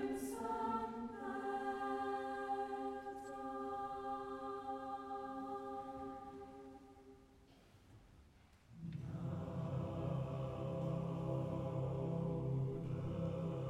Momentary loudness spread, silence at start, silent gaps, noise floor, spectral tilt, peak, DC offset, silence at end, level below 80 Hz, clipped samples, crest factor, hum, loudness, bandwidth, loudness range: 10 LU; 0 s; none; -66 dBFS; -8 dB/octave; -30 dBFS; under 0.1%; 0 s; -64 dBFS; under 0.1%; 14 dB; none; -44 LUFS; 14 kHz; 10 LU